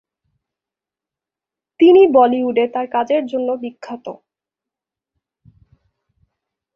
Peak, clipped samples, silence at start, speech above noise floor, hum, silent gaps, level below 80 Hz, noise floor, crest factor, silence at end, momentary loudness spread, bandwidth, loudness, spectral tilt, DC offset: -2 dBFS; under 0.1%; 1.8 s; 73 dB; none; none; -64 dBFS; -87 dBFS; 18 dB; 2.6 s; 21 LU; 6.6 kHz; -14 LUFS; -6.5 dB/octave; under 0.1%